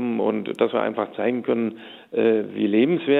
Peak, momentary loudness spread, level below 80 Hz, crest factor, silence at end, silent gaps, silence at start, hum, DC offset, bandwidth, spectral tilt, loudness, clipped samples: -6 dBFS; 7 LU; -76 dBFS; 16 dB; 0 s; none; 0 s; none; under 0.1%; 4.1 kHz; -8 dB/octave; -23 LUFS; under 0.1%